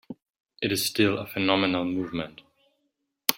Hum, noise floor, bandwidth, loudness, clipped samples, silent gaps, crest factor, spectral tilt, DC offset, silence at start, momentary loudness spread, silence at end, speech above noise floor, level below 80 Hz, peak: none; -77 dBFS; 16.5 kHz; -26 LUFS; under 0.1%; 0.30-0.34 s, 0.40-0.44 s; 28 dB; -3.5 dB/octave; under 0.1%; 0.1 s; 15 LU; 0 s; 51 dB; -64 dBFS; 0 dBFS